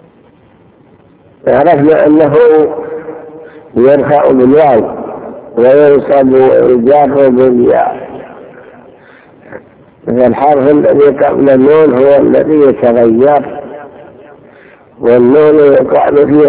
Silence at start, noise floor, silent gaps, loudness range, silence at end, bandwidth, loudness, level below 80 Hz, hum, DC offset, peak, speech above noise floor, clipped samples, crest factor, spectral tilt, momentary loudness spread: 1.45 s; -43 dBFS; none; 4 LU; 0 s; 4 kHz; -7 LUFS; -44 dBFS; none; under 0.1%; 0 dBFS; 37 dB; 3%; 8 dB; -11.5 dB/octave; 17 LU